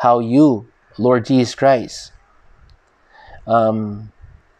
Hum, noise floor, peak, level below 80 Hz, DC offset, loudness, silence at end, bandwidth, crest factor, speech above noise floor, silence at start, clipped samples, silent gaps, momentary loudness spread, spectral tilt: none; -51 dBFS; -2 dBFS; -50 dBFS; under 0.1%; -16 LUFS; 0.5 s; 9.8 kHz; 16 dB; 36 dB; 0 s; under 0.1%; none; 18 LU; -7 dB/octave